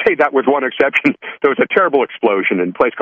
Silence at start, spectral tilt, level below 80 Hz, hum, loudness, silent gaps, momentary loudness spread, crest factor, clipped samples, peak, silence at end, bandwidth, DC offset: 0 s; -6.5 dB/octave; -58 dBFS; none; -15 LUFS; none; 4 LU; 14 dB; under 0.1%; 0 dBFS; 0 s; 7.4 kHz; under 0.1%